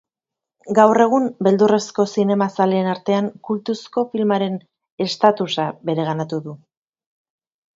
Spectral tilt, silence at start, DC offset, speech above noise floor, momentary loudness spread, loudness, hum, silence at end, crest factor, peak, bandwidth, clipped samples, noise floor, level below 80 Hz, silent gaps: -6 dB/octave; 0.65 s; under 0.1%; 68 dB; 10 LU; -19 LUFS; none; 1.2 s; 20 dB; 0 dBFS; 7.8 kHz; under 0.1%; -86 dBFS; -68 dBFS; 4.92-4.98 s